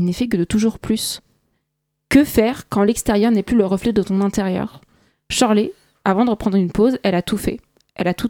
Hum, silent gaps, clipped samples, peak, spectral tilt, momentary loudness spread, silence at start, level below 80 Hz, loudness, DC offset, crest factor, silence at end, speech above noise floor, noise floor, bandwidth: none; none; under 0.1%; 0 dBFS; -5.5 dB/octave; 8 LU; 0 s; -42 dBFS; -18 LUFS; under 0.1%; 18 dB; 0 s; 57 dB; -75 dBFS; 18 kHz